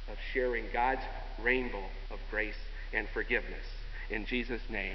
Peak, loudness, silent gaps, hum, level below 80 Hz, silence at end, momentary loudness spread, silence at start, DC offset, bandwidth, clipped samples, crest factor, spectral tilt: -14 dBFS; -35 LUFS; none; none; -40 dBFS; 0 s; 13 LU; 0 s; under 0.1%; 6 kHz; under 0.1%; 20 dB; -6.5 dB/octave